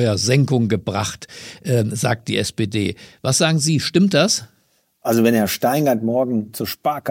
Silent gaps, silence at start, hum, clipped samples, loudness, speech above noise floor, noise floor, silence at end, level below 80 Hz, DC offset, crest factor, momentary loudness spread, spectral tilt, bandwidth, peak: none; 0 s; none; under 0.1%; -19 LUFS; 44 dB; -63 dBFS; 0 s; -54 dBFS; under 0.1%; 16 dB; 10 LU; -5 dB/octave; 16.5 kHz; -2 dBFS